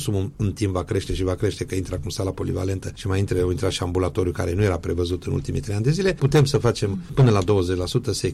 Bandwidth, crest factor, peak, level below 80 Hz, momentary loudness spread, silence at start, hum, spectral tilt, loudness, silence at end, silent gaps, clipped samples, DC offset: 13.5 kHz; 14 dB; -8 dBFS; -38 dBFS; 9 LU; 0 s; none; -6.5 dB/octave; -23 LUFS; 0 s; none; under 0.1%; under 0.1%